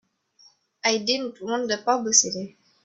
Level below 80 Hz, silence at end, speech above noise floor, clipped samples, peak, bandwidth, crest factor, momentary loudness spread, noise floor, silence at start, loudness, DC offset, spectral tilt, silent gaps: -72 dBFS; 0.35 s; 34 dB; under 0.1%; -2 dBFS; 8.4 kHz; 24 dB; 11 LU; -58 dBFS; 0.85 s; -23 LUFS; under 0.1%; -1 dB/octave; none